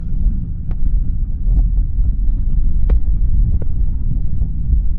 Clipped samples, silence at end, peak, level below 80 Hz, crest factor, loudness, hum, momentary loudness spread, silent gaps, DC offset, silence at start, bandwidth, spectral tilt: under 0.1%; 0 s; -4 dBFS; -14 dBFS; 10 dB; -21 LUFS; none; 4 LU; none; under 0.1%; 0 s; 1.5 kHz; -12.5 dB/octave